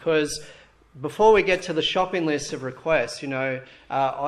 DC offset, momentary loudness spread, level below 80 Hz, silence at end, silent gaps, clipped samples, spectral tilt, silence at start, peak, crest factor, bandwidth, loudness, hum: under 0.1%; 15 LU; -52 dBFS; 0 s; none; under 0.1%; -4 dB/octave; 0 s; -6 dBFS; 18 dB; 12.5 kHz; -23 LUFS; none